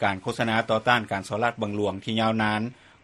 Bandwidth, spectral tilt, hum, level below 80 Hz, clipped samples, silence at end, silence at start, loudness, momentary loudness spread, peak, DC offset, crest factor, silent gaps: 12.5 kHz; -5.5 dB/octave; none; -60 dBFS; under 0.1%; 0.3 s; 0 s; -25 LUFS; 6 LU; -4 dBFS; under 0.1%; 22 dB; none